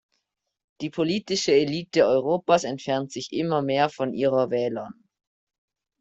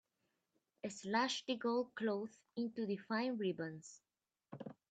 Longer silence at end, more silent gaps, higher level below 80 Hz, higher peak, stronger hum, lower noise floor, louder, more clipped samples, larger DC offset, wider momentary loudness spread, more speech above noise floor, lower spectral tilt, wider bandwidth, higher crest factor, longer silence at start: first, 1.1 s vs 0.15 s; neither; first, -66 dBFS vs -88 dBFS; first, -6 dBFS vs -22 dBFS; neither; second, -79 dBFS vs -86 dBFS; first, -24 LUFS vs -41 LUFS; neither; neither; second, 9 LU vs 16 LU; first, 55 dB vs 45 dB; about the same, -5 dB/octave vs -4.5 dB/octave; about the same, 8.2 kHz vs 9 kHz; about the same, 18 dB vs 20 dB; about the same, 0.8 s vs 0.85 s